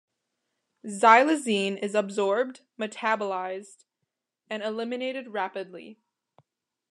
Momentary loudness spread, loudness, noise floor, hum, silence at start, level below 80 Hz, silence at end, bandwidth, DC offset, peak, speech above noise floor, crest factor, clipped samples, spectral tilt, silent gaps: 20 LU; -26 LUFS; -83 dBFS; none; 0.85 s; under -90 dBFS; 0.95 s; 12.5 kHz; under 0.1%; -4 dBFS; 57 dB; 24 dB; under 0.1%; -4 dB/octave; none